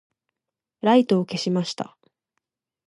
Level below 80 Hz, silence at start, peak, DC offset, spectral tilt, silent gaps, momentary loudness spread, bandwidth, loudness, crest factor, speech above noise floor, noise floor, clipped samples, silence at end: -76 dBFS; 0.85 s; -6 dBFS; under 0.1%; -6 dB/octave; none; 14 LU; 11 kHz; -22 LUFS; 18 dB; 66 dB; -87 dBFS; under 0.1%; 1.05 s